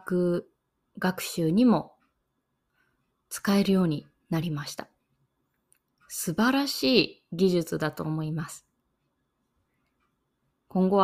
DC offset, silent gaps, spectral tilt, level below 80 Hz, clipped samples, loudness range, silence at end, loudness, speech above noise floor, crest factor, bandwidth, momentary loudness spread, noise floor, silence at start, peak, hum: under 0.1%; none; -5.5 dB/octave; -64 dBFS; under 0.1%; 5 LU; 0 s; -27 LUFS; 52 dB; 22 dB; 16 kHz; 14 LU; -78 dBFS; 0.05 s; -6 dBFS; none